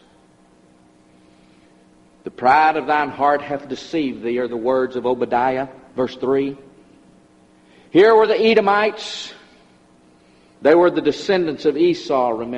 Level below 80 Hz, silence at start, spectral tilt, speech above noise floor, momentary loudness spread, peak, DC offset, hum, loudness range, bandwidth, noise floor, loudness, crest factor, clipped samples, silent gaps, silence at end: -60 dBFS; 2.25 s; -5.5 dB/octave; 35 dB; 14 LU; -2 dBFS; under 0.1%; none; 4 LU; 8.6 kHz; -52 dBFS; -18 LUFS; 18 dB; under 0.1%; none; 0 s